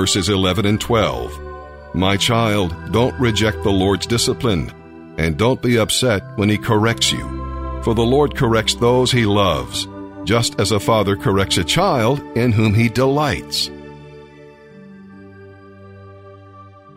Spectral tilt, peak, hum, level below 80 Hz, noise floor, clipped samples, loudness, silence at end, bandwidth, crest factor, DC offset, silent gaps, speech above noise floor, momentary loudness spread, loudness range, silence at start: -5 dB/octave; -2 dBFS; none; -36 dBFS; -42 dBFS; under 0.1%; -17 LUFS; 0.3 s; 16 kHz; 16 dB; under 0.1%; none; 25 dB; 12 LU; 3 LU; 0 s